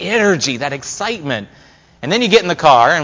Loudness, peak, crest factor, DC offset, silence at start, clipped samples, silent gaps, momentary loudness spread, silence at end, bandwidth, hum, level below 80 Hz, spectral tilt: -14 LUFS; 0 dBFS; 14 dB; under 0.1%; 0 s; under 0.1%; none; 12 LU; 0 s; 7.6 kHz; none; -50 dBFS; -3.5 dB/octave